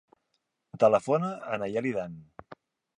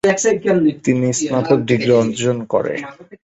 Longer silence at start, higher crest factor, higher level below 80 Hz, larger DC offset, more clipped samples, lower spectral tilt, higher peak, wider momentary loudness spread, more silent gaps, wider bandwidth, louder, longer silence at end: first, 0.75 s vs 0.05 s; about the same, 20 dB vs 16 dB; second, -68 dBFS vs -54 dBFS; neither; neither; first, -7 dB/octave vs -5 dB/octave; second, -10 dBFS vs -2 dBFS; first, 14 LU vs 6 LU; neither; about the same, 10.5 kHz vs 10.5 kHz; second, -28 LUFS vs -17 LUFS; first, 0.45 s vs 0.1 s